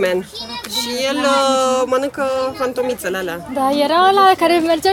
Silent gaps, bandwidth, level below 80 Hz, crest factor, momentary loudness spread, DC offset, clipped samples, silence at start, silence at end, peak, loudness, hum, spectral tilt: none; 18.5 kHz; -52 dBFS; 14 dB; 10 LU; under 0.1%; under 0.1%; 0 s; 0 s; -2 dBFS; -16 LUFS; none; -3 dB/octave